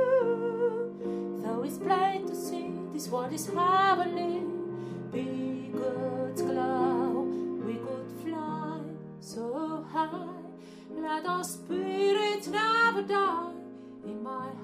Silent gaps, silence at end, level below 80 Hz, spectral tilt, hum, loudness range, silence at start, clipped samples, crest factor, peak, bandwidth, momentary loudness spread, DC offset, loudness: none; 0 s; -74 dBFS; -5 dB/octave; none; 6 LU; 0 s; under 0.1%; 16 dB; -14 dBFS; 15.5 kHz; 14 LU; under 0.1%; -31 LUFS